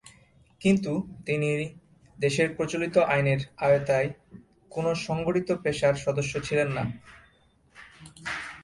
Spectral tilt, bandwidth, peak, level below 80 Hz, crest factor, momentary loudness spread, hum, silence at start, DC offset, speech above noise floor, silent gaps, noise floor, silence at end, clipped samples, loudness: -6 dB/octave; 11.5 kHz; -10 dBFS; -56 dBFS; 18 dB; 12 LU; none; 0.05 s; under 0.1%; 36 dB; none; -62 dBFS; 0 s; under 0.1%; -27 LUFS